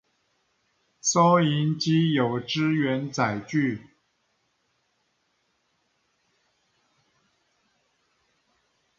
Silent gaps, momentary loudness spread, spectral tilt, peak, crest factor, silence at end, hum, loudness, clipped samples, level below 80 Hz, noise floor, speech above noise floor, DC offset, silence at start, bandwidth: none; 8 LU; -5 dB/octave; -6 dBFS; 22 dB; 5.2 s; none; -24 LUFS; under 0.1%; -68 dBFS; -72 dBFS; 49 dB; under 0.1%; 1.05 s; 7.6 kHz